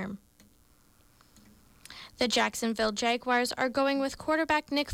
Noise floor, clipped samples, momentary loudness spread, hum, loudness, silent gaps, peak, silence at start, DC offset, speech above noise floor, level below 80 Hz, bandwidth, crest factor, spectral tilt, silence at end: -62 dBFS; under 0.1%; 19 LU; none; -28 LUFS; none; -16 dBFS; 0 s; under 0.1%; 34 dB; -60 dBFS; 19.5 kHz; 14 dB; -3 dB/octave; 0 s